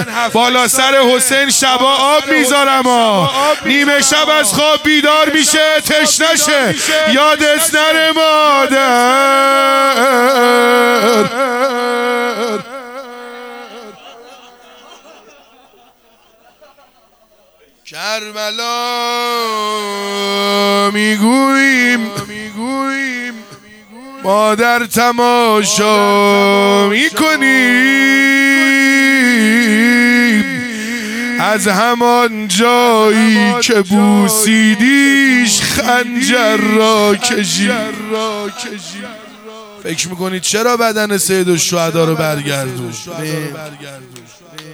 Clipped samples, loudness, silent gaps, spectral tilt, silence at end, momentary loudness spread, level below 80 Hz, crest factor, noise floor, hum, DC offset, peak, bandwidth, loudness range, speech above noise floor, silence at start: under 0.1%; -11 LUFS; none; -3 dB/octave; 0 s; 13 LU; -54 dBFS; 12 dB; -50 dBFS; none; under 0.1%; 0 dBFS; 18.5 kHz; 9 LU; 39 dB; 0 s